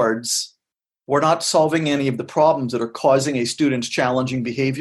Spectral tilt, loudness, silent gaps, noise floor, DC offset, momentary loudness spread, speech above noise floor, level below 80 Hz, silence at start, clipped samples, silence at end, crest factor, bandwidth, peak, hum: -4.5 dB/octave; -19 LUFS; none; -88 dBFS; under 0.1%; 5 LU; 68 dB; -62 dBFS; 0 s; under 0.1%; 0 s; 16 dB; 12.5 kHz; -4 dBFS; none